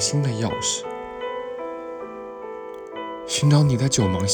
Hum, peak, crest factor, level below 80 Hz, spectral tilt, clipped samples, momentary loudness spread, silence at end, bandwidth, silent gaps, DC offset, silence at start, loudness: none; -6 dBFS; 18 dB; -52 dBFS; -4.5 dB/octave; under 0.1%; 17 LU; 0 s; 18.5 kHz; none; under 0.1%; 0 s; -23 LUFS